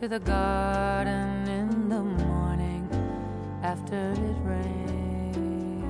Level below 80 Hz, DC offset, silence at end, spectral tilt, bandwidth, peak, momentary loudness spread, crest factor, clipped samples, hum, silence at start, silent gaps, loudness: -36 dBFS; under 0.1%; 0 s; -7.5 dB/octave; 10.5 kHz; -14 dBFS; 5 LU; 14 dB; under 0.1%; none; 0 s; none; -29 LUFS